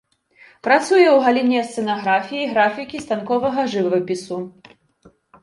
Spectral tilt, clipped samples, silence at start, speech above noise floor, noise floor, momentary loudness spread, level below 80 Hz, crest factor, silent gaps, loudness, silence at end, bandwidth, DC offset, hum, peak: -5 dB/octave; under 0.1%; 0.65 s; 35 dB; -54 dBFS; 15 LU; -64 dBFS; 18 dB; none; -18 LUFS; 0.95 s; 11.5 kHz; under 0.1%; none; -2 dBFS